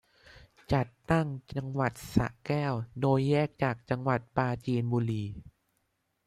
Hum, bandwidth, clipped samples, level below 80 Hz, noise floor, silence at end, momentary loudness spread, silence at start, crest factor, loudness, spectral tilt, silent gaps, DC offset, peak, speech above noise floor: none; 14.5 kHz; under 0.1%; -54 dBFS; -77 dBFS; 0.75 s; 7 LU; 0.7 s; 22 dB; -31 LUFS; -7.5 dB/octave; none; under 0.1%; -8 dBFS; 48 dB